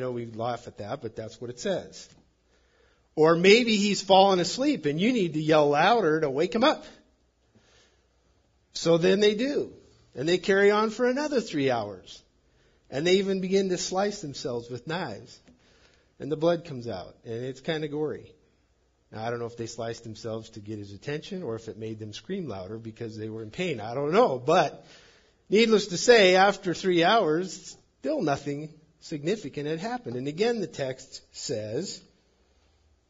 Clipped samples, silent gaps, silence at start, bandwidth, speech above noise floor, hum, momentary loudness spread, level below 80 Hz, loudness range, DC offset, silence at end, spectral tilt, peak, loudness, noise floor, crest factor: under 0.1%; none; 0 s; 7.8 kHz; 42 dB; none; 18 LU; -64 dBFS; 13 LU; under 0.1%; 1.1 s; -4.5 dB/octave; -4 dBFS; -26 LUFS; -68 dBFS; 22 dB